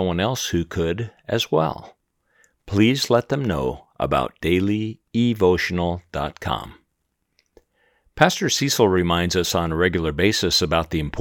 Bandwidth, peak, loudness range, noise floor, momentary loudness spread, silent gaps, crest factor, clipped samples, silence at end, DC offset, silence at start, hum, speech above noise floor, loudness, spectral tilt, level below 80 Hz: 19.5 kHz; 0 dBFS; 5 LU; -74 dBFS; 10 LU; none; 22 dB; under 0.1%; 0 s; under 0.1%; 0 s; none; 53 dB; -21 LUFS; -4.5 dB/octave; -44 dBFS